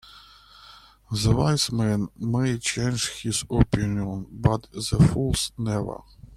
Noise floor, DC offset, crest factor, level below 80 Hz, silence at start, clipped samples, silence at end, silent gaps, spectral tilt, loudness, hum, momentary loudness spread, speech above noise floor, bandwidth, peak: -50 dBFS; under 0.1%; 22 dB; -38 dBFS; 0.1 s; under 0.1%; 0 s; none; -5 dB/octave; -24 LUFS; none; 9 LU; 26 dB; 15.5 kHz; -4 dBFS